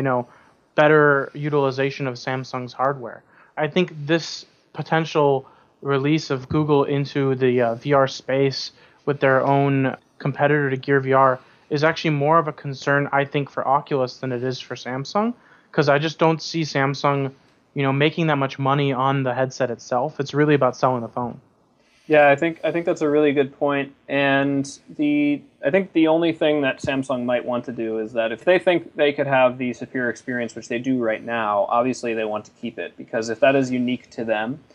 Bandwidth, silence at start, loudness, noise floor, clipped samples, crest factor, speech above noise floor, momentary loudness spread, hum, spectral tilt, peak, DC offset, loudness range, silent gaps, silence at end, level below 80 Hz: 9.8 kHz; 0 s; -21 LUFS; -59 dBFS; under 0.1%; 18 dB; 39 dB; 10 LU; none; -6.5 dB/octave; -2 dBFS; under 0.1%; 4 LU; none; 0.15 s; -64 dBFS